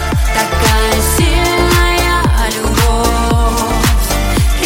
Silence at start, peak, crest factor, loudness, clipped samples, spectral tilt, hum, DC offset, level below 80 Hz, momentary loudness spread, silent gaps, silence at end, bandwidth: 0 s; 0 dBFS; 12 dB; -12 LUFS; under 0.1%; -4 dB/octave; none; under 0.1%; -14 dBFS; 3 LU; none; 0 s; 17 kHz